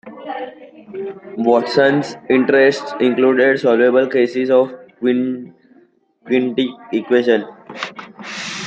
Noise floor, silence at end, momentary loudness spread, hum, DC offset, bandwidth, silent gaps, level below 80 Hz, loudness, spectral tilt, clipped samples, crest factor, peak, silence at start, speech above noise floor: -53 dBFS; 0 s; 16 LU; none; under 0.1%; 8.4 kHz; none; -66 dBFS; -16 LUFS; -5.5 dB/octave; under 0.1%; 16 dB; 0 dBFS; 0.05 s; 37 dB